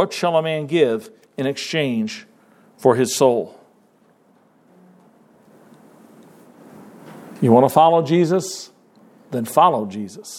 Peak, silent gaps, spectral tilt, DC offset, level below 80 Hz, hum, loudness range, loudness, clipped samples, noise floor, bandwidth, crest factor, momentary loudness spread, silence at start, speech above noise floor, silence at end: 0 dBFS; none; -5.5 dB/octave; under 0.1%; -72 dBFS; none; 6 LU; -18 LUFS; under 0.1%; -56 dBFS; 16.5 kHz; 20 dB; 19 LU; 0 s; 39 dB; 0 s